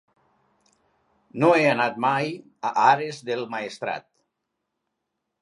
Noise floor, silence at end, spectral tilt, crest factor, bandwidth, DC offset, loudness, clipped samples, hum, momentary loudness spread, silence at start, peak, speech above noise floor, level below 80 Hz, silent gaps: -80 dBFS; 1.4 s; -5.5 dB/octave; 20 dB; 11.5 kHz; under 0.1%; -23 LUFS; under 0.1%; none; 13 LU; 1.35 s; -4 dBFS; 58 dB; -78 dBFS; none